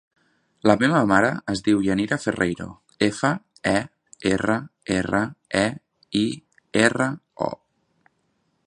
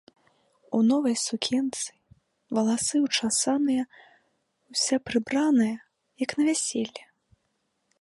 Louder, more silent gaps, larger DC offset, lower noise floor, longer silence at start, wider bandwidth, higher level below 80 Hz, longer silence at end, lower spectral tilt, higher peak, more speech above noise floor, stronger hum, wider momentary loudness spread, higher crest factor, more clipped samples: first, -23 LUFS vs -26 LUFS; neither; neither; second, -70 dBFS vs -75 dBFS; about the same, 0.65 s vs 0.7 s; about the same, 11 kHz vs 11.5 kHz; first, -52 dBFS vs -68 dBFS; about the same, 1.1 s vs 1.05 s; first, -5 dB/octave vs -3 dB/octave; first, 0 dBFS vs -10 dBFS; about the same, 48 dB vs 50 dB; neither; about the same, 11 LU vs 10 LU; about the same, 22 dB vs 18 dB; neither